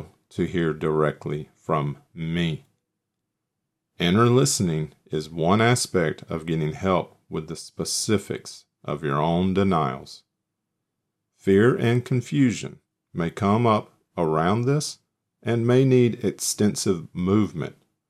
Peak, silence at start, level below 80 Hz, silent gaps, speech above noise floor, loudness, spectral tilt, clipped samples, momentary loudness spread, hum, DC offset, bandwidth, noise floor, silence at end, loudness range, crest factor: -6 dBFS; 0 s; -56 dBFS; none; 59 dB; -23 LUFS; -5.5 dB/octave; under 0.1%; 15 LU; none; under 0.1%; 15 kHz; -81 dBFS; 0.4 s; 5 LU; 18 dB